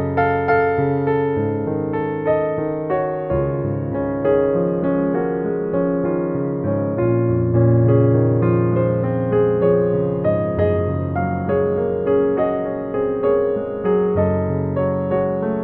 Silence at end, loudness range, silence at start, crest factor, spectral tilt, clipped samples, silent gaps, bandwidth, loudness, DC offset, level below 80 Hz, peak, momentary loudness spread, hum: 0 s; 3 LU; 0 s; 14 dB; -9.5 dB/octave; under 0.1%; none; 4.3 kHz; -19 LUFS; under 0.1%; -44 dBFS; -4 dBFS; 6 LU; none